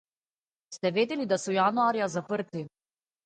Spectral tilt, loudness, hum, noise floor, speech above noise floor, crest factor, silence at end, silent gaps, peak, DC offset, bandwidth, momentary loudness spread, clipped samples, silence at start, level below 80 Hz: -5 dB/octave; -28 LUFS; none; under -90 dBFS; over 62 dB; 16 dB; 0.55 s; none; -12 dBFS; under 0.1%; 9.4 kHz; 15 LU; under 0.1%; 0.7 s; -78 dBFS